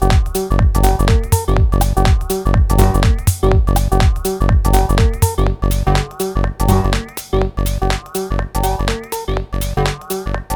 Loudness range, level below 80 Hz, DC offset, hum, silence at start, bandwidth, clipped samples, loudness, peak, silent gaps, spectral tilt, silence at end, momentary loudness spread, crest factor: 5 LU; -16 dBFS; under 0.1%; none; 0 s; 19.5 kHz; under 0.1%; -16 LUFS; 0 dBFS; none; -5.5 dB/octave; 0 s; 7 LU; 14 dB